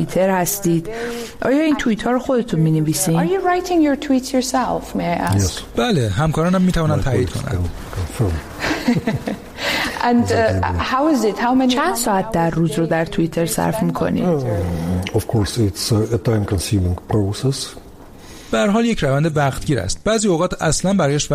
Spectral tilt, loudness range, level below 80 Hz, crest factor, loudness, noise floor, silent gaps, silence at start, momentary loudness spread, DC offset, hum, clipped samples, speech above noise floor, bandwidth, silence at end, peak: -5.5 dB/octave; 2 LU; -36 dBFS; 14 dB; -18 LUFS; -39 dBFS; none; 0 s; 6 LU; under 0.1%; none; under 0.1%; 21 dB; 15.5 kHz; 0 s; -4 dBFS